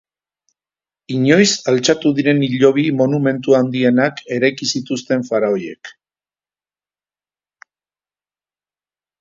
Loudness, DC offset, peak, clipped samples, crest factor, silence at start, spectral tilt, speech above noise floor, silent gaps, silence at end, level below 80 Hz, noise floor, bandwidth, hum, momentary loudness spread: -16 LUFS; under 0.1%; 0 dBFS; under 0.1%; 18 dB; 1.1 s; -5 dB/octave; over 75 dB; none; 3.3 s; -62 dBFS; under -90 dBFS; 7.8 kHz; 50 Hz at -50 dBFS; 8 LU